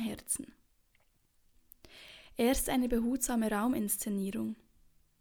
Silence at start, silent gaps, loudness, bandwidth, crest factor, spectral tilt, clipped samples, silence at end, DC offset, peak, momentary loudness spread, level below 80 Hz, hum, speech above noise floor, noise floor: 0 s; none; -33 LUFS; over 20 kHz; 18 dB; -4 dB/octave; under 0.1%; 0.65 s; under 0.1%; -16 dBFS; 20 LU; -52 dBFS; none; 38 dB; -71 dBFS